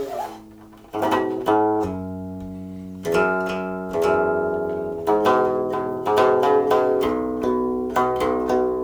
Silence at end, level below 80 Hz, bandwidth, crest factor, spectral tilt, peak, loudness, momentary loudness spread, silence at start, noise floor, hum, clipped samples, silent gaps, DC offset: 0 s; -50 dBFS; over 20 kHz; 16 dB; -6.5 dB/octave; -4 dBFS; -21 LUFS; 14 LU; 0 s; -44 dBFS; none; under 0.1%; none; under 0.1%